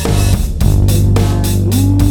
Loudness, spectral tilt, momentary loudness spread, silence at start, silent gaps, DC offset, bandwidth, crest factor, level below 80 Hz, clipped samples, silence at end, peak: -13 LUFS; -6 dB/octave; 3 LU; 0 s; none; under 0.1%; over 20 kHz; 10 dB; -16 dBFS; under 0.1%; 0 s; 0 dBFS